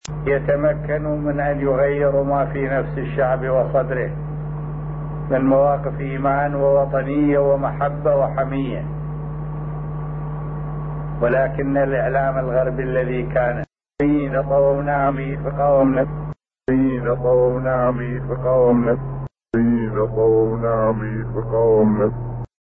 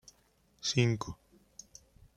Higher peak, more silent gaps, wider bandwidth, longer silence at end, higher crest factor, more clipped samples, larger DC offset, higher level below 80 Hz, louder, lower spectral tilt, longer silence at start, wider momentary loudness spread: first, -6 dBFS vs -14 dBFS; neither; second, 7.8 kHz vs 11 kHz; second, 0.15 s vs 1.05 s; second, 14 dB vs 22 dB; neither; neither; first, -36 dBFS vs -62 dBFS; first, -20 LUFS vs -32 LUFS; first, -9.5 dB/octave vs -4.5 dB/octave; second, 0.1 s vs 0.65 s; second, 11 LU vs 24 LU